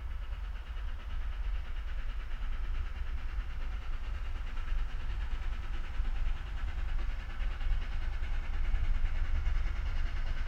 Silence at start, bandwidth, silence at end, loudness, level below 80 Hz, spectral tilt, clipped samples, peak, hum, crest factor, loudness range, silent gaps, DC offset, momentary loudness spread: 0 s; 5.8 kHz; 0 s; -40 LUFS; -32 dBFS; -6 dB/octave; under 0.1%; -18 dBFS; none; 14 dB; 3 LU; none; under 0.1%; 6 LU